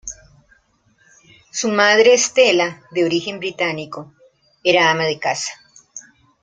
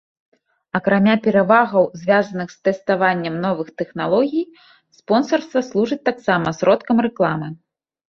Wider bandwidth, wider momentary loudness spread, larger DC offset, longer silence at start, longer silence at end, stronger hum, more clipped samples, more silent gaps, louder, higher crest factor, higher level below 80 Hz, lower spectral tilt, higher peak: first, 9.6 kHz vs 7 kHz; first, 22 LU vs 10 LU; neither; second, 0.05 s vs 0.75 s; second, 0.4 s vs 0.55 s; neither; neither; neither; about the same, -17 LUFS vs -18 LUFS; about the same, 18 dB vs 18 dB; about the same, -60 dBFS vs -60 dBFS; second, -2.5 dB/octave vs -6.5 dB/octave; about the same, 0 dBFS vs -2 dBFS